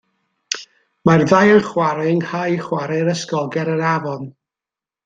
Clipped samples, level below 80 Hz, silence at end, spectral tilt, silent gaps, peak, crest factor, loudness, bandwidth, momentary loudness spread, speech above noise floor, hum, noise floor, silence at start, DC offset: under 0.1%; -58 dBFS; 0.75 s; -6 dB/octave; none; 0 dBFS; 18 dB; -17 LUFS; 9.2 kHz; 14 LU; 72 dB; none; -89 dBFS; 0.5 s; under 0.1%